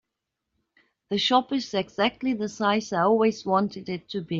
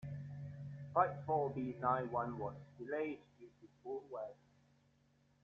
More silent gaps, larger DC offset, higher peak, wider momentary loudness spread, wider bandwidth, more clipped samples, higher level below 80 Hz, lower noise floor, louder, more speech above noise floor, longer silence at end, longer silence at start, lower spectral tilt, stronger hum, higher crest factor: neither; neither; first, -8 dBFS vs -18 dBFS; second, 9 LU vs 16 LU; first, 7.6 kHz vs 6.8 kHz; neither; first, -66 dBFS vs -74 dBFS; first, -83 dBFS vs -74 dBFS; first, -25 LUFS vs -41 LUFS; first, 59 dB vs 34 dB; second, 0 s vs 1.1 s; first, 1.1 s vs 0 s; second, -5 dB/octave vs -7.5 dB/octave; neither; second, 18 dB vs 24 dB